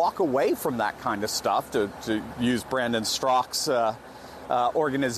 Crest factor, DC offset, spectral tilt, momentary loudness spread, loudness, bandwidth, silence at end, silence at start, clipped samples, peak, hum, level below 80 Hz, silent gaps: 14 dB; under 0.1%; -3.5 dB/octave; 6 LU; -26 LUFS; 13.5 kHz; 0 s; 0 s; under 0.1%; -12 dBFS; none; -56 dBFS; none